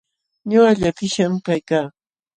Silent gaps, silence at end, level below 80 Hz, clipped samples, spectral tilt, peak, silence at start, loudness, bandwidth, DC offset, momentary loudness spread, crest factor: none; 0.45 s; -50 dBFS; under 0.1%; -5.5 dB/octave; -4 dBFS; 0.45 s; -18 LUFS; 9.8 kHz; under 0.1%; 11 LU; 16 dB